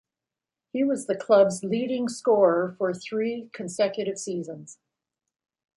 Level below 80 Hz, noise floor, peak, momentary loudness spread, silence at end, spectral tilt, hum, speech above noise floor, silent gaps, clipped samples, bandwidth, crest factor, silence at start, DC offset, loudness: -74 dBFS; -89 dBFS; -8 dBFS; 15 LU; 1.05 s; -5 dB/octave; none; 64 dB; none; under 0.1%; 11.5 kHz; 18 dB; 0.75 s; under 0.1%; -25 LUFS